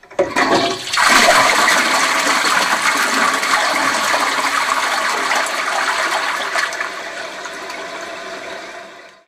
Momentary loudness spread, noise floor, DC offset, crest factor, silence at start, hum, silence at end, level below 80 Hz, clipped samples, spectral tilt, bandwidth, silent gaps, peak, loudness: 16 LU; -37 dBFS; under 0.1%; 16 dB; 0.1 s; none; 0.2 s; -54 dBFS; under 0.1%; -0.5 dB/octave; 16 kHz; none; -2 dBFS; -14 LUFS